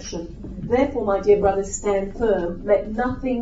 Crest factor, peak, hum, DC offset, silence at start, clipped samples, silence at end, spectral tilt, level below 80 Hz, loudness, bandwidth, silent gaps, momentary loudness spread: 16 dB; -6 dBFS; none; under 0.1%; 0 s; under 0.1%; 0 s; -5.5 dB/octave; -38 dBFS; -21 LUFS; 8 kHz; none; 14 LU